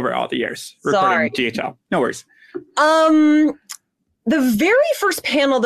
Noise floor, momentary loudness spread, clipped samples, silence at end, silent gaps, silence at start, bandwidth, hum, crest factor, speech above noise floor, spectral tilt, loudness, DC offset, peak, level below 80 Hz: -61 dBFS; 20 LU; under 0.1%; 0 s; none; 0 s; 14 kHz; none; 12 dB; 44 dB; -4 dB/octave; -17 LUFS; under 0.1%; -6 dBFS; -60 dBFS